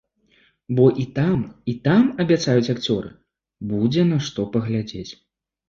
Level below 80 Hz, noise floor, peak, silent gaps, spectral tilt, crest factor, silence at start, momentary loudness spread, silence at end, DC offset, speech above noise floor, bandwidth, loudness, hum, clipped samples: -52 dBFS; -60 dBFS; -2 dBFS; none; -7 dB/octave; 18 dB; 0.7 s; 13 LU; 0.55 s; under 0.1%; 40 dB; 7.4 kHz; -21 LUFS; none; under 0.1%